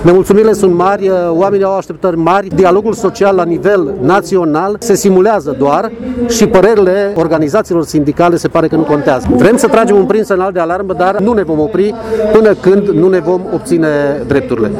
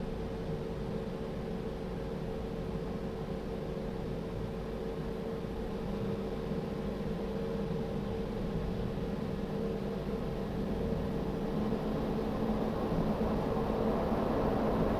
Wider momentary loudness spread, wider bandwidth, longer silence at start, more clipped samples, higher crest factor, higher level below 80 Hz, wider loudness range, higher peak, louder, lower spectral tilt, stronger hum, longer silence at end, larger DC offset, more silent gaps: about the same, 6 LU vs 7 LU; about the same, 15.5 kHz vs 16 kHz; about the same, 0 s vs 0 s; first, 0.4% vs under 0.1%; second, 10 dB vs 16 dB; first, -36 dBFS vs -44 dBFS; second, 1 LU vs 5 LU; first, 0 dBFS vs -18 dBFS; first, -10 LUFS vs -36 LUFS; second, -6 dB/octave vs -8 dB/octave; neither; about the same, 0 s vs 0 s; neither; neither